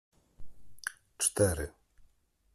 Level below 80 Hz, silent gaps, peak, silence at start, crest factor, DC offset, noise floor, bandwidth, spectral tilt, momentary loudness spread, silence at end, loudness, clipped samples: -54 dBFS; none; -14 dBFS; 0.4 s; 22 dB; under 0.1%; -66 dBFS; 15 kHz; -3.5 dB/octave; 14 LU; 0.5 s; -32 LUFS; under 0.1%